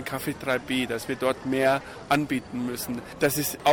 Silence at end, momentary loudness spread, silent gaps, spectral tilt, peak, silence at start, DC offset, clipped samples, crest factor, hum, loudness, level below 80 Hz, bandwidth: 0 s; 7 LU; none; -4 dB/octave; -10 dBFS; 0 s; under 0.1%; under 0.1%; 16 dB; none; -27 LUFS; -56 dBFS; 17.5 kHz